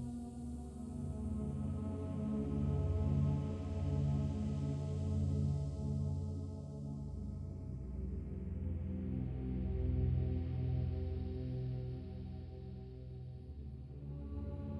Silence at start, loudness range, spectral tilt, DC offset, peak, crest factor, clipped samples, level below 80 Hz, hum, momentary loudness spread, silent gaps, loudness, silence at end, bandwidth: 0 s; 6 LU; -9.5 dB/octave; under 0.1%; -24 dBFS; 16 dB; under 0.1%; -46 dBFS; none; 12 LU; none; -41 LUFS; 0 s; 9.4 kHz